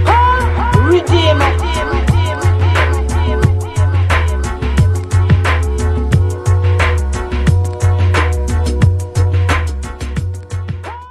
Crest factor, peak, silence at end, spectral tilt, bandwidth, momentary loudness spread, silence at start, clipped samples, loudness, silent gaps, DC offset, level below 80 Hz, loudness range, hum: 12 dB; 0 dBFS; 0 s; -6.5 dB/octave; 12.5 kHz; 10 LU; 0 s; under 0.1%; -14 LUFS; none; under 0.1%; -18 dBFS; 2 LU; none